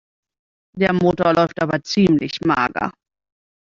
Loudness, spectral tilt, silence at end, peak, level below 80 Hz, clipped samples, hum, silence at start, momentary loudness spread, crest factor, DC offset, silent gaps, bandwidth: -18 LUFS; -6.5 dB/octave; 0.7 s; -2 dBFS; -52 dBFS; under 0.1%; none; 0.75 s; 6 LU; 18 dB; under 0.1%; none; 7.4 kHz